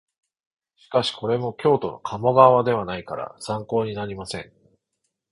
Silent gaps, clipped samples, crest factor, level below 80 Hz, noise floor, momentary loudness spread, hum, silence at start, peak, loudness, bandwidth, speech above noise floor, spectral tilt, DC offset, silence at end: none; under 0.1%; 22 dB; -58 dBFS; -78 dBFS; 17 LU; none; 0.9 s; 0 dBFS; -22 LUFS; 11.5 kHz; 56 dB; -6 dB/octave; under 0.1%; 0.9 s